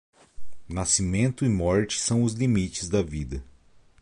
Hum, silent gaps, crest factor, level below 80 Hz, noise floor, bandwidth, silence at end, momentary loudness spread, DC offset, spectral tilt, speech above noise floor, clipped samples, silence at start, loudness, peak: none; none; 18 dB; -42 dBFS; -55 dBFS; 11.5 kHz; 0 s; 11 LU; under 0.1%; -5 dB/octave; 30 dB; under 0.1%; 0.15 s; -25 LUFS; -10 dBFS